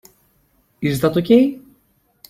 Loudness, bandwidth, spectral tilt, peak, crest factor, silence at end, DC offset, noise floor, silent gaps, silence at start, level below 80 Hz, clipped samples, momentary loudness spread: -17 LUFS; 16 kHz; -7 dB/octave; -2 dBFS; 18 dB; 0.7 s; under 0.1%; -61 dBFS; none; 0.8 s; -54 dBFS; under 0.1%; 11 LU